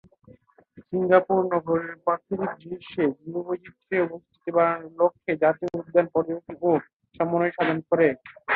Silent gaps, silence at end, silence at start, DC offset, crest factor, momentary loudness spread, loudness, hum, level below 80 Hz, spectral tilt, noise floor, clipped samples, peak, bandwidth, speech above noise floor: 6.93-7.00 s; 0 s; 0.75 s; under 0.1%; 20 dB; 10 LU; -25 LUFS; none; -66 dBFS; -9.5 dB/octave; -55 dBFS; under 0.1%; -4 dBFS; 4.5 kHz; 30 dB